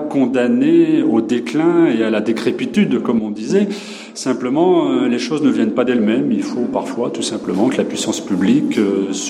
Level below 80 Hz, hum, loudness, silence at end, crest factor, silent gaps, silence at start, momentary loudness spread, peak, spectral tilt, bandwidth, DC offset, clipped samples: -62 dBFS; none; -16 LUFS; 0 s; 12 dB; none; 0 s; 7 LU; -2 dBFS; -5.5 dB/octave; 12 kHz; under 0.1%; under 0.1%